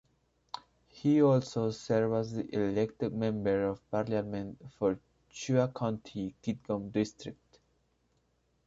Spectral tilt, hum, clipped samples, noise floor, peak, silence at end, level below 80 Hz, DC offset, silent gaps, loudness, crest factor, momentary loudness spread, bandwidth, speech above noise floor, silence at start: -7 dB/octave; none; under 0.1%; -74 dBFS; -14 dBFS; 1.35 s; -64 dBFS; under 0.1%; none; -32 LUFS; 18 dB; 17 LU; 7.8 kHz; 43 dB; 0.55 s